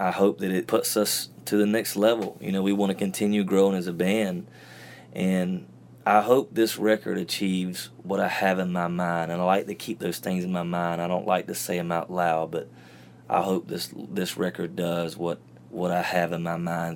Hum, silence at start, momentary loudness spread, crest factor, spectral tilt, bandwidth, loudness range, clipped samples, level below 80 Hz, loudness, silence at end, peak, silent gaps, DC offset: none; 0 s; 10 LU; 20 dB; -5 dB/octave; 17.5 kHz; 4 LU; under 0.1%; -68 dBFS; -26 LUFS; 0 s; -6 dBFS; none; under 0.1%